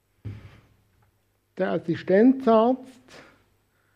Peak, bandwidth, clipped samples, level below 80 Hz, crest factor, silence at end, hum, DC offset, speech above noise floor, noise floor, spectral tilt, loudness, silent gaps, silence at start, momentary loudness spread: -6 dBFS; 7 kHz; under 0.1%; -64 dBFS; 20 dB; 1.1 s; none; under 0.1%; 47 dB; -68 dBFS; -8.5 dB/octave; -22 LUFS; none; 0.25 s; 23 LU